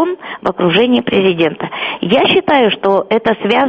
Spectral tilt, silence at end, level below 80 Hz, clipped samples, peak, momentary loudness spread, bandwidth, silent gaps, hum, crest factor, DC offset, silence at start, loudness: -7.5 dB/octave; 0 s; -50 dBFS; under 0.1%; 0 dBFS; 9 LU; 6.4 kHz; none; none; 12 dB; under 0.1%; 0 s; -13 LUFS